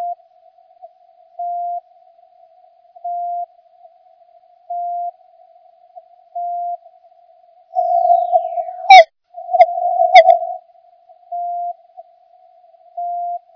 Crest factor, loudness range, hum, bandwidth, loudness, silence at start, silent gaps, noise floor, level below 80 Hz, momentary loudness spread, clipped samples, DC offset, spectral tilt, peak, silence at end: 18 dB; 18 LU; none; 5.4 kHz; -15 LUFS; 0 s; none; -50 dBFS; -70 dBFS; 24 LU; 0.4%; under 0.1%; 1.5 dB/octave; 0 dBFS; 0.15 s